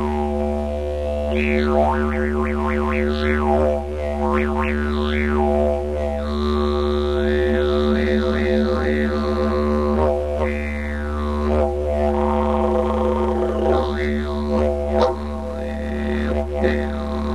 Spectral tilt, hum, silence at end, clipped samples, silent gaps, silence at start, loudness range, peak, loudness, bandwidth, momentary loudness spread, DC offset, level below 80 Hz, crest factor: -7.5 dB/octave; none; 0 s; under 0.1%; none; 0 s; 2 LU; -4 dBFS; -21 LUFS; 10.5 kHz; 6 LU; 1%; -26 dBFS; 16 dB